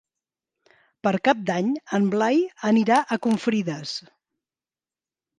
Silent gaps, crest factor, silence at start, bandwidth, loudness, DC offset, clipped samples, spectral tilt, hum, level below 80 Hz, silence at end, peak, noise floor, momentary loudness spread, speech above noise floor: none; 20 dB; 1.05 s; 11.5 kHz; -23 LUFS; under 0.1%; under 0.1%; -6 dB/octave; none; -72 dBFS; 1.4 s; -6 dBFS; under -90 dBFS; 9 LU; over 68 dB